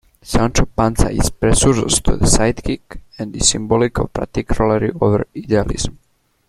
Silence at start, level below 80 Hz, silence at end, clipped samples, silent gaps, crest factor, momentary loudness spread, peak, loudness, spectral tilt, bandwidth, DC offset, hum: 0.25 s; -24 dBFS; 0.55 s; under 0.1%; none; 16 dB; 10 LU; 0 dBFS; -17 LUFS; -4.5 dB/octave; 14 kHz; under 0.1%; none